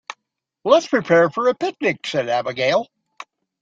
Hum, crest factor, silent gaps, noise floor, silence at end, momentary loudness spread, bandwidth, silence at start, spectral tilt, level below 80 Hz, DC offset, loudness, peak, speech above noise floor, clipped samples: none; 18 dB; none; -78 dBFS; 0.4 s; 10 LU; 7.8 kHz; 0.1 s; -5 dB/octave; -66 dBFS; under 0.1%; -19 LUFS; -2 dBFS; 60 dB; under 0.1%